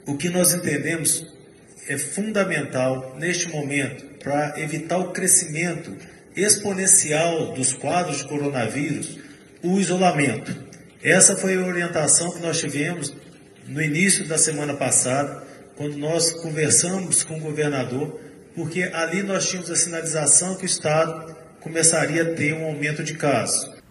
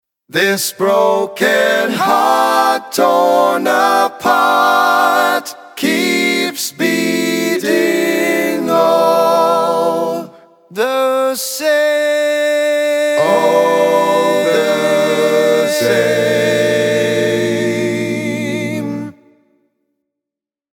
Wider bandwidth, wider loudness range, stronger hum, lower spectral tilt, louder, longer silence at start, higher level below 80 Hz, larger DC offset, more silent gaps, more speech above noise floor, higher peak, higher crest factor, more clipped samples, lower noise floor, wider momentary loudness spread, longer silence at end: second, 13 kHz vs 18 kHz; about the same, 5 LU vs 3 LU; neither; about the same, -3 dB/octave vs -3.5 dB/octave; second, -20 LUFS vs -13 LUFS; second, 0.05 s vs 0.35 s; about the same, -64 dBFS vs -68 dBFS; neither; neither; second, 24 dB vs 73 dB; about the same, 0 dBFS vs 0 dBFS; first, 22 dB vs 14 dB; neither; second, -46 dBFS vs -86 dBFS; first, 14 LU vs 7 LU; second, 0.1 s vs 1.65 s